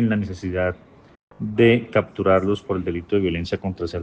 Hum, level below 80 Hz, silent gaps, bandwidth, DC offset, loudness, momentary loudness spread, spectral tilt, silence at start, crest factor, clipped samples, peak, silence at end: none; -50 dBFS; 1.23-1.28 s; 8.4 kHz; under 0.1%; -22 LUFS; 10 LU; -8 dB/octave; 0 s; 18 dB; under 0.1%; -4 dBFS; 0 s